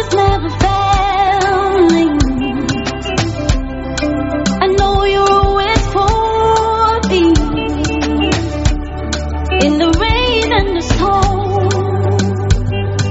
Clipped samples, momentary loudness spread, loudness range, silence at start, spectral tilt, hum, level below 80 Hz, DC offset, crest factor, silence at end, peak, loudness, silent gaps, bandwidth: under 0.1%; 6 LU; 2 LU; 0 s; -5.5 dB/octave; none; -22 dBFS; under 0.1%; 12 dB; 0 s; 0 dBFS; -14 LUFS; none; 8.2 kHz